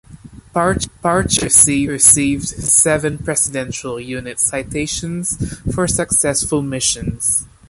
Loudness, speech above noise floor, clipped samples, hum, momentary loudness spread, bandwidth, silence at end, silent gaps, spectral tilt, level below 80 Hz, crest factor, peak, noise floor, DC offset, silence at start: -15 LUFS; 22 dB; under 0.1%; none; 13 LU; 16 kHz; 0.25 s; none; -3 dB/octave; -36 dBFS; 18 dB; 0 dBFS; -39 dBFS; under 0.1%; 0.1 s